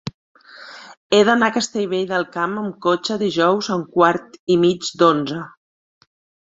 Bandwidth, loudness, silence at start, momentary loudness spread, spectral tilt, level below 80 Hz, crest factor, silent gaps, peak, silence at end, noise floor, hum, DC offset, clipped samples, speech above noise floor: 8 kHz; -18 LUFS; 0.05 s; 18 LU; -4.5 dB/octave; -62 dBFS; 18 dB; 0.14-0.35 s, 0.97-1.10 s, 4.39-4.47 s; -2 dBFS; 1 s; -40 dBFS; none; under 0.1%; under 0.1%; 22 dB